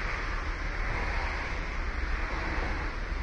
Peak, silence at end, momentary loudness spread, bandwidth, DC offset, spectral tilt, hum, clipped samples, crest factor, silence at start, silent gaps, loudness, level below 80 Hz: -20 dBFS; 0 s; 3 LU; 8 kHz; under 0.1%; -5 dB/octave; none; under 0.1%; 12 dB; 0 s; none; -34 LUFS; -34 dBFS